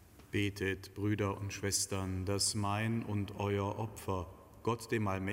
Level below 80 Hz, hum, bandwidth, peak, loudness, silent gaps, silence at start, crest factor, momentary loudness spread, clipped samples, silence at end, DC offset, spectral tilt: -60 dBFS; none; 16 kHz; -18 dBFS; -36 LUFS; none; 0 s; 18 dB; 7 LU; under 0.1%; 0 s; under 0.1%; -4.5 dB/octave